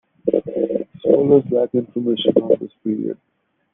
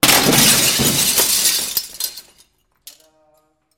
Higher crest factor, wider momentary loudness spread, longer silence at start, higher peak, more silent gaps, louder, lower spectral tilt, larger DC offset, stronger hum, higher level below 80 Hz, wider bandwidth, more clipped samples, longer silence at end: about the same, 18 dB vs 18 dB; second, 10 LU vs 14 LU; first, 0.25 s vs 0.05 s; about the same, -2 dBFS vs 0 dBFS; neither; second, -19 LUFS vs -13 LUFS; first, -10.5 dB/octave vs -1.5 dB/octave; neither; neither; second, -62 dBFS vs -44 dBFS; second, 3.8 kHz vs 17 kHz; neither; second, 0.6 s vs 1.55 s